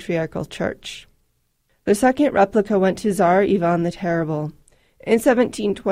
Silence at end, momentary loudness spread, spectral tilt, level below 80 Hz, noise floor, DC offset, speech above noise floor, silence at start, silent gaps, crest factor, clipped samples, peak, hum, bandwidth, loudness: 0 s; 14 LU; -6 dB/octave; -50 dBFS; -66 dBFS; under 0.1%; 48 dB; 0 s; none; 16 dB; under 0.1%; -4 dBFS; none; 16 kHz; -19 LUFS